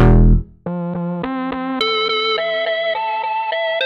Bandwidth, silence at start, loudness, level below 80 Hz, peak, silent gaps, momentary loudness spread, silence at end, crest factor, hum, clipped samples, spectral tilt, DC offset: 6 kHz; 0 s; -19 LUFS; -22 dBFS; -2 dBFS; none; 8 LU; 0 s; 14 dB; none; under 0.1%; -7.5 dB/octave; under 0.1%